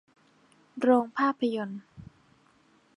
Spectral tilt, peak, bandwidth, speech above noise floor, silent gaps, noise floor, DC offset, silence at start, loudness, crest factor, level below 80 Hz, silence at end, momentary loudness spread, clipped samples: -6.5 dB/octave; -10 dBFS; 11 kHz; 37 dB; none; -64 dBFS; under 0.1%; 0.75 s; -27 LUFS; 22 dB; -70 dBFS; 0.95 s; 18 LU; under 0.1%